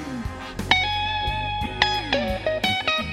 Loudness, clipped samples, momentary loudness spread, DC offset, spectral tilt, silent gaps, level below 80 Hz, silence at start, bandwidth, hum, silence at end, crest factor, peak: -23 LUFS; under 0.1%; 12 LU; under 0.1%; -4 dB/octave; none; -38 dBFS; 0 s; 16.5 kHz; none; 0 s; 24 dB; 0 dBFS